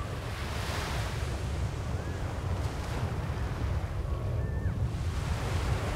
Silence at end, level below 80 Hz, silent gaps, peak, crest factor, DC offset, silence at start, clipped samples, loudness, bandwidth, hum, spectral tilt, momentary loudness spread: 0 s; -38 dBFS; none; -18 dBFS; 14 dB; under 0.1%; 0 s; under 0.1%; -34 LUFS; 16 kHz; none; -6 dB/octave; 3 LU